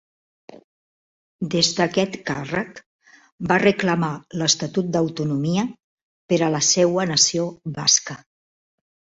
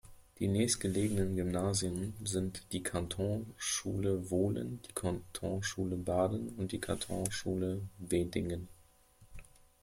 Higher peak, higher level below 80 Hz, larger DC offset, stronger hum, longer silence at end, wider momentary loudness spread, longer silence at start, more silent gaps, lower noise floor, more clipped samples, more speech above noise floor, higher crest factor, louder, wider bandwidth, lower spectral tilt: first, -2 dBFS vs -16 dBFS; about the same, -58 dBFS vs -56 dBFS; neither; neither; first, 1.05 s vs 0.4 s; first, 11 LU vs 7 LU; first, 0.5 s vs 0.05 s; first, 0.64-1.39 s, 2.86-2.99 s, 3.32-3.38 s, 5.84-6.29 s vs none; first, under -90 dBFS vs -63 dBFS; neither; first, over 69 dB vs 28 dB; about the same, 22 dB vs 20 dB; first, -20 LUFS vs -36 LUFS; second, 8 kHz vs 16.5 kHz; second, -3.5 dB/octave vs -5 dB/octave